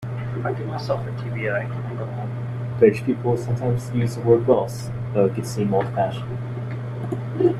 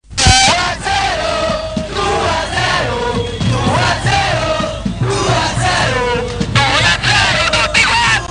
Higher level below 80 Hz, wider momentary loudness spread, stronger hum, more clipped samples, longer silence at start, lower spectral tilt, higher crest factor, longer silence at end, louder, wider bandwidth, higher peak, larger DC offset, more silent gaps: second, -50 dBFS vs -28 dBFS; first, 12 LU vs 8 LU; neither; neither; about the same, 0 s vs 0.1 s; first, -8 dB/octave vs -3.5 dB/octave; first, 20 dB vs 14 dB; about the same, 0 s vs 0.05 s; second, -23 LUFS vs -13 LUFS; first, 13 kHz vs 10.5 kHz; about the same, -2 dBFS vs 0 dBFS; neither; neither